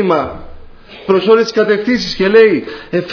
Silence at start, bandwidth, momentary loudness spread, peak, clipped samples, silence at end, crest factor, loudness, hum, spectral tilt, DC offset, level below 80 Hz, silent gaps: 0 s; 5.4 kHz; 14 LU; 0 dBFS; under 0.1%; 0 s; 12 dB; -12 LUFS; none; -5.5 dB/octave; under 0.1%; -40 dBFS; none